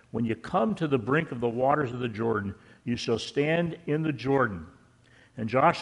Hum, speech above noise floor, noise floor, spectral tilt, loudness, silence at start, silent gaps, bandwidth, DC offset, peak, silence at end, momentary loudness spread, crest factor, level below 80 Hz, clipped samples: none; 31 dB; -58 dBFS; -6.5 dB/octave; -28 LUFS; 0.15 s; none; 11 kHz; under 0.1%; -8 dBFS; 0 s; 9 LU; 20 dB; -60 dBFS; under 0.1%